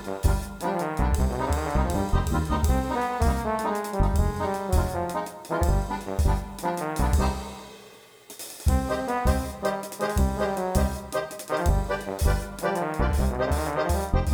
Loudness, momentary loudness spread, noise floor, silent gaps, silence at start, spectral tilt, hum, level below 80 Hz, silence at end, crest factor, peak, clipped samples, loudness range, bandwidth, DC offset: -27 LUFS; 5 LU; -49 dBFS; none; 0 s; -6 dB/octave; none; -30 dBFS; 0 s; 16 dB; -8 dBFS; under 0.1%; 3 LU; over 20 kHz; under 0.1%